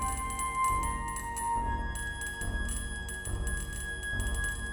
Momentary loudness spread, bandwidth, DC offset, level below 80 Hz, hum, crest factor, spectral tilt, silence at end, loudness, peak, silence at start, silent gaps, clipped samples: 6 LU; 19 kHz; under 0.1%; -38 dBFS; none; 14 dB; -3 dB/octave; 0 s; -34 LUFS; -18 dBFS; 0 s; none; under 0.1%